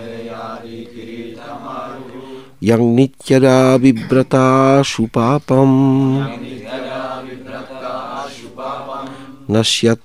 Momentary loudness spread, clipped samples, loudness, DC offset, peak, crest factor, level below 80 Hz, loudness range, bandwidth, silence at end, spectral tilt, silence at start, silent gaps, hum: 19 LU; under 0.1%; -14 LUFS; 0.6%; 0 dBFS; 16 dB; -50 dBFS; 10 LU; 12.5 kHz; 0.1 s; -6 dB/octave; 0 s; none; none